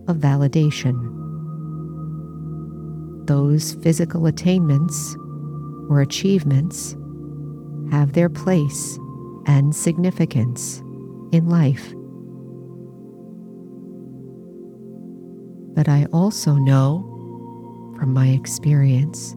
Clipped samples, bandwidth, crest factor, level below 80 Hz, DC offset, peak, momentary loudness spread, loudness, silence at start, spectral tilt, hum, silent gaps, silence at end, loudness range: under 0.1%; 14.5 kHz; 16 dB; -52 dBFS; under 0.1%; -4 dBFS; 21 LU; -20 LUFS; 0 s; -6.5 dB/octave; none; none; 0 s; 6 LU